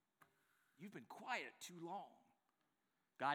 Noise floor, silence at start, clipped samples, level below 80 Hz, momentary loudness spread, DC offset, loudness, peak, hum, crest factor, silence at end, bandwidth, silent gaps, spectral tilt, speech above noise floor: -88 dBFS; 0.8 s; under 0.1%; under -90 dBFS; 13 LU; under 0.1%; -51 LUFS; -28 dBFS; none; 24 dB; 0 s; over 20 kHz; none; -3.5 dB/octave; 36 dB